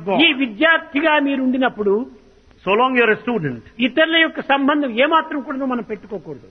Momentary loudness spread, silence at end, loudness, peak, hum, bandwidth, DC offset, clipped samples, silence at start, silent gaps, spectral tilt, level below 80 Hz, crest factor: 13 LU; 0.05 s; -17 LUFS; 0 dBFS; none; 6 kHz; under 0.1%; under 0.1%; 0 s; none; -7 dB/octave; -56 dBFS; 18 dB